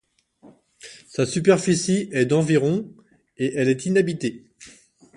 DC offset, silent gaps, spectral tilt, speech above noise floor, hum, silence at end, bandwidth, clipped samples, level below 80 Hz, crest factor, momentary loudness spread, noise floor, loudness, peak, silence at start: under 0.1%; none; -5.5 dB/octave; 32 dB; none; 0.45 s; 11.5 kHz; under 0.1%; -62 dBFS; 20 dB; 18 LU; -53 dBFS; -21 LUFS; -4 dBFS; 0.85 s